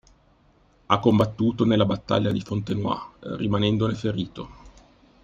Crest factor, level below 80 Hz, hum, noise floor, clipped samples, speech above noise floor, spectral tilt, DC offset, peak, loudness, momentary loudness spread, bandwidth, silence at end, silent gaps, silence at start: 22 dB; -52 dBFS; none; -59 dBFS; under 0.1%; 36 dB; -7.5 dB/octave; under 0.1%; -2 dBFS; -24 LUFS; 11 LU; 7.4 kHz; 0.55 s; none; 0.9 s